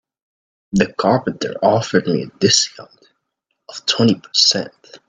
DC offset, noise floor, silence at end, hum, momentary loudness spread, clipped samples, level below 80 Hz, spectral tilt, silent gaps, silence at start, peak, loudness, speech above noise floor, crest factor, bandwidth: under 0.1%; -74 dBFS; 0.1 s; none; 10 LU; under 0.1%; -54 dBFS; -3.5 dB/octave; none; 0.75 s; 0 dBFS; -16 LUFS; 57 dB; 18 dB; 9.6 kHz